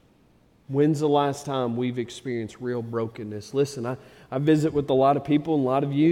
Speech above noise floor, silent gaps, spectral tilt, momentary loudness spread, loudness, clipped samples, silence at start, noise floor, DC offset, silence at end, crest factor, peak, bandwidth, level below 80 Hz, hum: 35 dB; none; -7 dB/octave; 11 LU; -25 LUFS; under 0.1%; 0.7 s; -59 dBFS; under 0.1%; 0 s; 16 dB; -8 dBFS; 12.5 kHz; -60 dBFS; none